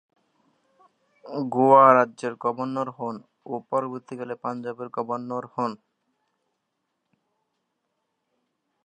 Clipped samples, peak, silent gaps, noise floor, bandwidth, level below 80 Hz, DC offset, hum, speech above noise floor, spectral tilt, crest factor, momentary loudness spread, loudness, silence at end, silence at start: under 0.1%; -2 dBFS; none; -78 dBFS; 9.6 kHz; -82 dBFS; under 0.1%; none; 55 dB; -7.5 dB/octave; 24 dB; 20 LU; -23 LUFS; 3.1 s; 1.25 s